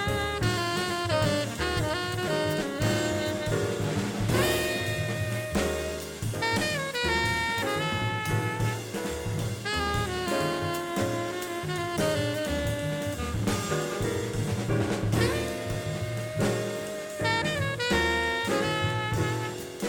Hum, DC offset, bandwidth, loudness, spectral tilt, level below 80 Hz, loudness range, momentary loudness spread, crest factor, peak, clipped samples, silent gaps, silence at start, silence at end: none; under 0.1%; 19 kHz; -28 LUFS; -4.5 dB/octave; -44 dBFS; 2 LU; 6 LU; 16 dB; -12 dBFS; under 0.1%; none; 0 s; 0 s